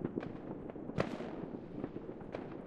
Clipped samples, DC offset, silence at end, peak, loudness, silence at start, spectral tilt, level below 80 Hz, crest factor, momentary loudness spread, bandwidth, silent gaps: under 0.1%; under 0.1%; 0 s; -16 dBFS; -43 LUFS; 0 s; -8 dB/octave; -60 dBFS; 26 dB; 7 LU; 10.5 kHz; none